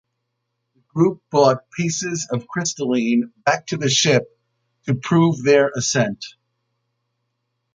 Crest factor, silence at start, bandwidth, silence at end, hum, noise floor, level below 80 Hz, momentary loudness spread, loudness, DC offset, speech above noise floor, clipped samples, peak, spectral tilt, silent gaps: 20 dB; 0.95 s; 9.6 kHz; 1.45 s; none; -76 dBFS; -62 dBFS; 9 LU; -19 LUFS; under 0.1%; 57 dB; under 0.1%; -2 dBFS; -4.5 dB/octave; none